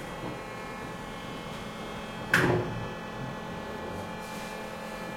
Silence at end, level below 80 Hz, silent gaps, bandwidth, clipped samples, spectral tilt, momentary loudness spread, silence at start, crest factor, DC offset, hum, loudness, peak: 0 s; -54 dBFS; none; 16.5 kHz; under 0.1%; -5 dB/octave; 12 LU; 0 s; 26 dB; under 0.1%; none; -34 LUFS; -8 dBFS